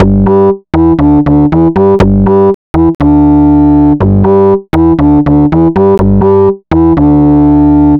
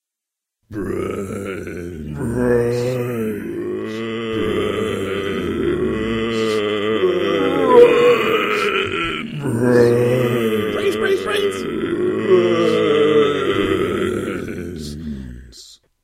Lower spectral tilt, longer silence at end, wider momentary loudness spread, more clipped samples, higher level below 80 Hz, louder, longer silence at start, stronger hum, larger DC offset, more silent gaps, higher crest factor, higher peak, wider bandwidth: first, -10.5 dB/octave vs -6 dB/octave; second, 0 s vs 0.3 s; second, 3 LU vs 14 LU; first, 0.3% vs under 0.1%; first, -20 dBFS vs -44 dBFS; first, -7 LUFS vs -18 LUFS; second, 0 s vs 0.7 s; neither; neither; first, 2.54-2.74 s, 2.95-2.99 s vs none; second, 6 dB vs 18 dB; about the same, 0 dBFS vs 0 dBFS; second, 5 kHz vs 16 kHz